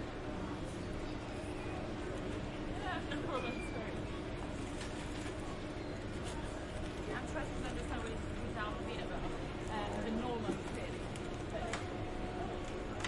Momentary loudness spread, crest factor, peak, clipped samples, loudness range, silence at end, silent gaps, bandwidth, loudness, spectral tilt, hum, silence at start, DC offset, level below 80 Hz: 4 LU; 16 dB; -24 dBFS; under 0.1%; 2 LU; 0 s; none; 11.5 kHz; -42 LUFS; -5.5 dB/octave; none; 0 s; under 0.1%; -48 dBFS